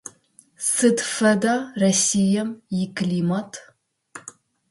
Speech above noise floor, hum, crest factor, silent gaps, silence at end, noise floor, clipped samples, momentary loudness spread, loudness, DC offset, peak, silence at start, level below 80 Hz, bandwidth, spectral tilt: 35 dB; none; 16 dB; none; 0.4 s; -55 dBFS; under 0.1%; 21 LU; -21 LUFS; under 0.1%; -6 dBFS; 0.6 s; -64 dBFS; 11.5 kHz; -4 dB/octave